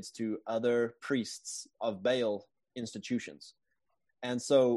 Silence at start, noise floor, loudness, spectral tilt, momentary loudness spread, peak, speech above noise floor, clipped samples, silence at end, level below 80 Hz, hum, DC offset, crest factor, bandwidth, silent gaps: 0 s; -83 dBFS; -34 LUFS; -4.5 dB/octave; 13 LU; -14 dBFS; 51 dB; under 0.1%; 0 s; -80 dBFS; none; under 0.1%; 20 dB; 12 kHz; none